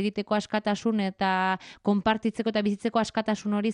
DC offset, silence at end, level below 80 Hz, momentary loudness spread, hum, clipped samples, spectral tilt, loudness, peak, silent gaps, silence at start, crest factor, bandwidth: under 0.1%; 0 s; -62 dBFS; 3 LU; none; under 0.1%; -5.5 dB/octave; -27 LUFS; -12 dBFS; none; 0 s; 16 dB; 10.5 kHz